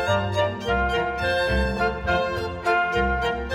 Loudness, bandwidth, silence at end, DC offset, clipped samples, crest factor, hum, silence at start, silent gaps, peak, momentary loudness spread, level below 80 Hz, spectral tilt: -23 LUFS; 15 kHz; 0 s; under 0.1%; under 0.1%; 14 dB; none; 0 s; none; -10 dBFS; 3 LU; -34 dBFS; -5.5 dB/octave